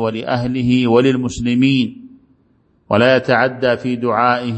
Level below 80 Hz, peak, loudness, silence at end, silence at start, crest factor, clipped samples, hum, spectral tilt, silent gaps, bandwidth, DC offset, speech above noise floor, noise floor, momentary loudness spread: -46 dBFS; 0 dBFS; -16 LUFS; 0 s; 0 s; 16 dB; under 0.1%; none; -6.5 dB/octave; none; 8.6 kHz; under 0.1%; 42 dB; -57 dBFS; 6 LU